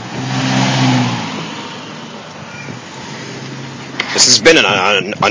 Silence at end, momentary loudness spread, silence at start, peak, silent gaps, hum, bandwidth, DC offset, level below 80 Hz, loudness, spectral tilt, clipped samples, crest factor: 0 s; 21 LU; 0 s; 0 dBFS; none; none; 8 kHz; under 0.1%; -52 dBFS; -11 LUFS; -3 dB/octave; 0.2%; 16 dB